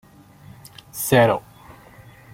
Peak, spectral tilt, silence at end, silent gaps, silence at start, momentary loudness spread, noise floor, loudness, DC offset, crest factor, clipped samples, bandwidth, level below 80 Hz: -2 dBFS; -5 dB/octave; 0.95 s; none; 0.95 s; 26 LU; -46 dBFS; -19 LUFS; under 0.1%; 22 dB; under 0.1%; 16.5 kHz; -56 dBFS